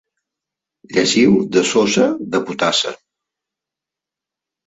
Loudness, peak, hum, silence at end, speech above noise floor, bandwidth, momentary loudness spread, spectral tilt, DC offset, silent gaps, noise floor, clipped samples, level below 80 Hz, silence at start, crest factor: -16 LUFS; -2 dBFS; none; 1.7 s; 71 dB; 8 kHz; 8 LU; -4 dB/octave; under 0.1%; none; -86 dBFS; under 0.1%; -58 dBFS; 0.9 s; 18 dB